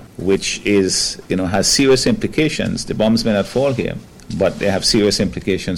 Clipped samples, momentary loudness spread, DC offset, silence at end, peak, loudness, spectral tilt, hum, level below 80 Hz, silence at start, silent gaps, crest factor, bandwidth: under 0.1%; 8 LU; under 0.1%; 0 s; -6 dBFS; -16 LUFS; -4 dB/octave; none; -38 dBFS; 0 s; none; 12 dB; 16.5 kHz